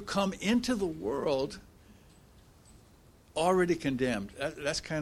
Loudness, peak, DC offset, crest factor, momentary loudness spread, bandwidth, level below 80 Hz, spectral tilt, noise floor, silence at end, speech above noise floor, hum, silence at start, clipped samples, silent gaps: -31 LUFS; -14 dBFS; under 0.1%; 18 dB; 9 LU; 15.5 kHz; -56 dBFS; -5 dB/octave; -59 dBFS; 0 s; 28 dB; none; 0 s; under 0.1%; none